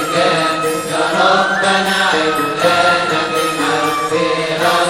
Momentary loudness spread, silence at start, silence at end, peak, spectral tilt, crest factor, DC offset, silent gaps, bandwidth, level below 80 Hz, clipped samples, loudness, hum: 4 LU; 0 s; 0 s; 0 dBFS; -3 dB/octave; 14 dB; 0.2%; none; 17 kHz; -52 dBFS; under 0.1%; -14 LUFS; none